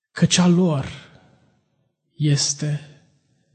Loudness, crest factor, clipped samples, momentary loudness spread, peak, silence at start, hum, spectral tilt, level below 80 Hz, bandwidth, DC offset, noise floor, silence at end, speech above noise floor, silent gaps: -20 LUFS; 16 dB; under 0.1%; 16 LU; -6 dBFS; 0.15 s; none; -4.5 dB/octave; -54 dBFS; 9.2 kHz; under 0.1%; -69 dBFS; 0.7 s; 50 dB; none